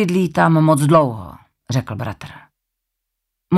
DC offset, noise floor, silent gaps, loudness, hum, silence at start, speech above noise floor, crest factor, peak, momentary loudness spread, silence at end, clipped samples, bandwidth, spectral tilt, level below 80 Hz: under 0.1%; -78 dBFS; none; -16 LUFS; none; 0 s; 62 dB; 16 dB; -2 dBFS; 21 LU; 0 s; under 0.1%; 14 kHz; -7 dB/octave; -52 dBFS